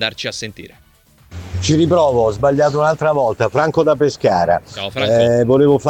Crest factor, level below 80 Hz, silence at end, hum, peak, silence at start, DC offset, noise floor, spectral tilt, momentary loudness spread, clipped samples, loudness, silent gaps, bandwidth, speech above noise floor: 12 dB; -44 dBFS; 0 s; none; -2 dBFS; 0 s; under 0.1%; -46 dBFS; -6 dB/octave; 11 LU; under 0.1%; -15 LUFS; none; 15.5 kHz; 31 dB